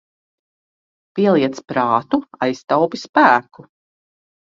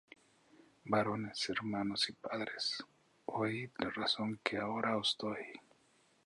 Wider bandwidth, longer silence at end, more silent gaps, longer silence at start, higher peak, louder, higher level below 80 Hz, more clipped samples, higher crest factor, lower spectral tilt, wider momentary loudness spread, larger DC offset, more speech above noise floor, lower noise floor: second, 7.6 kHz vs 11.5 kHz; first, 0.9 s vs 0.65 s; first, 3.09-3.13 s vs none; first, 1.15 s vs 0.85 s; first, 0 dBFS vs -16 dBFS; first, -17 LUFS vs -37 LUFS; first, -64 dBFS vs -74 dBFS; neither; about the same, 20 dB vs 24 dB; first, -6 dB/octave vs -4 dB/octave; about the same, 9 LU vs 11 LU; neither; first, over 73 dB vs 33 dB; first, under -90 dBFS vs -71 dBFS